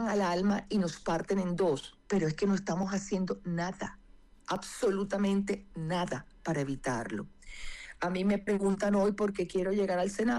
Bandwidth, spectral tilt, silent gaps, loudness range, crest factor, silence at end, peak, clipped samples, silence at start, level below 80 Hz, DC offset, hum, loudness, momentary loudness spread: 12 kHz; -6 dB/octave; none; 3 LU; 10 dB; 0 s; -22 dBFS; under 0.1%; 0 s; -54 dBFS; under 0.1%; none; -32 LUFS; 10 LU